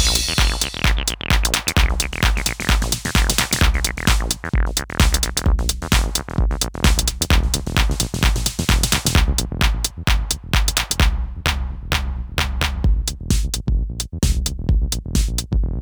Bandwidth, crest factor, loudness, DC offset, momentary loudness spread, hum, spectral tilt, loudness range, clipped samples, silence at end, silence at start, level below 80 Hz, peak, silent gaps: over 20 kHz; 18 dB; -20 LUFS; under 0.1%; 5 LU; none; -3 dB/octave; 3 LU; under 0.1%; 0 s; 0 s; -20 dBFS; 0 dBFS; none